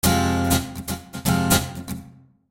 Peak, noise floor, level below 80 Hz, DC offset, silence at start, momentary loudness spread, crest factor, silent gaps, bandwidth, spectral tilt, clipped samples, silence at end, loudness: -2 dBFS; -47 dBFS; -38 dBFS; under 0.1%; 0.05 s; 15 LU; 20 dB; none; 17 kHz; -4.5 dB/octave; under 0.1%; 0.4 s; -22 LUFS